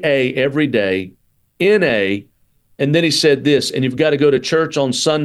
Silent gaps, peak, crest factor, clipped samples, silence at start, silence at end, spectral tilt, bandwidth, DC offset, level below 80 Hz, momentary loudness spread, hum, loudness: none; -2 dBFS; 14 dB; under 0.1%; 0 s; 0 s; -4.5 dB/octave; 12.5 kHz; under 0.1%; -56 dBFS; 7 LU; none; -16 LUFS